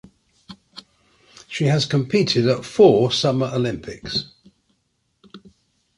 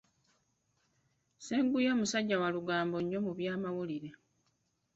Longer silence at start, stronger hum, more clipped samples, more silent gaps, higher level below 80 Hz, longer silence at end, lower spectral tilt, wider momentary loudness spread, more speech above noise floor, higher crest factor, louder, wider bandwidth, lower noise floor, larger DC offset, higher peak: second, 0.5 s vs 1.4 s; neither; neither; neither; first, -54 dBFS vs -74 dBFS; second, 0.6 s vs 0.8 s; about the same, -6 dB/octave vs -5 dB/octave; first, 18 LU vs 11 LU; first, 51 dB vs 45 dB; about the same, 20 dB vs 16 dB; first, -19 LUFS vs -34 LUFS; first, 11.5 kHz vs 8 kHz; second, -70 dBFS vs -78 dBFS; neither; first, -2 dBFS vs -18 dBFS